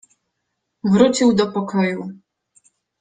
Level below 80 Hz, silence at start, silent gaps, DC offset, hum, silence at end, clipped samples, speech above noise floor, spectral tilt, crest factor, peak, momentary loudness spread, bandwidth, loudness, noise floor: -58 dBFS; 0.85 s; none; under 0.1%; none; 0.85 s; under 0.1%; 59 dB; -5.5 dB/octave; 18 dB; -2 dBFS; 14 LU; 9.4 kHz; -18 LUFS; -76 dBFS